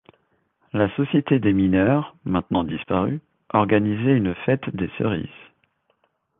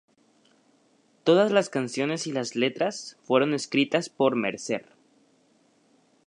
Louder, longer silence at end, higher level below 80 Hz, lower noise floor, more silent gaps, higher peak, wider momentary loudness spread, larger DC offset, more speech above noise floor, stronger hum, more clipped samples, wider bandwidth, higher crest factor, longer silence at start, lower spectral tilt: first, -22 LUFS vs -25 LUFS; second, 1.1 s vs 1.45 s; first, -48 dBFS vs -78 dBFS; first, -68 dBFS vs -64 dBFS; neither; first, -2 dBFS vs -6 dBFS; about the same, 9 LU vs 9 LU; neither; first, 47 dB vs 39 dB; neither; neither; second, 3.9 kHz vs 11 kHz; about the same, 20 dB vs 22 dB; second, 0.75 s vs 1.25 s; first, -11 dB/octave vs -4.5 dB/octave